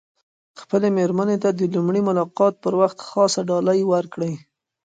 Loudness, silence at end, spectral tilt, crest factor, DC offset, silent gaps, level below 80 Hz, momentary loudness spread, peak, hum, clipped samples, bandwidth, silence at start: -20 LUFS; 0.45 s; -6 dB/octave; 16 dB; under 0.1%; none; -68 dBFS; 6 LU; -4 dBFS; none; under 0.1%; 9.4 kHz; 0.55 s